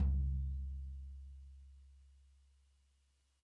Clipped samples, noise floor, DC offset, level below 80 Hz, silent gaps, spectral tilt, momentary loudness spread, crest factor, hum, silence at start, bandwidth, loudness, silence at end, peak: under 0.1%; -76 dBFS; under 0.1%; -44 dBFS; none; -10 dB/octave; 24 LU; 16 dB; none; 0 s; 1.4 kHz; -43 LUFS; 1.35 s; -26 dBFS